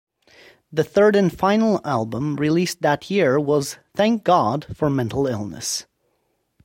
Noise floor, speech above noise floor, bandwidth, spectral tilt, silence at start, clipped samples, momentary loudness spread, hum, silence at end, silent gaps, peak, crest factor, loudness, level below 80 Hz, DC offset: -70 dBFS; 50 dB; 16.5 kHz; -5.5 dB/octave; 0.7 s; under 0.1%; 9 LU; none; 0.85 s; none; -4 dBFS; 16 dB; -20 LUFS; -54 dBFS; under 0.1%